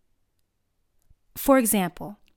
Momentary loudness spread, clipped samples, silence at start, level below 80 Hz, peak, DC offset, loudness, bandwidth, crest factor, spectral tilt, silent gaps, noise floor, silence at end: 21 LU; under 0.1%; 1.35 s; -52 dBFS; -6 dBFS; under 0.1%; -22 LUFS; 18 kHz; 20 dB; -4.5 dB/octave; none; -72 dBFS; 0.25 s